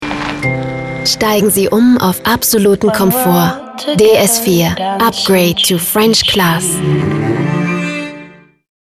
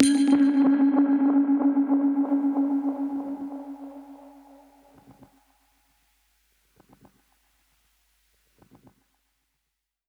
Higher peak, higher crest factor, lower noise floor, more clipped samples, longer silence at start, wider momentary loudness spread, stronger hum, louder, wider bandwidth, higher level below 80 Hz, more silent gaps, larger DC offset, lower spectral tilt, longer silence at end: about the same, 0 dBFS vs -2 dBFS; second, 12 dB vs 24 dB; second, -36 dBFS vs -81 dBFS; neither; about the same, 0 s vs 0 s; second, 8 LU vs 19 LU; neither; first, -12 LUFS vs -23 LUFS; first, 15.5 kHz vs 10.5 kHz; first, -40 dBFS vs -70 dBFS; neither; neither; about the same, -4 dB/octave vs -4 dB/octave; second, 0.65 s vs 5.9 s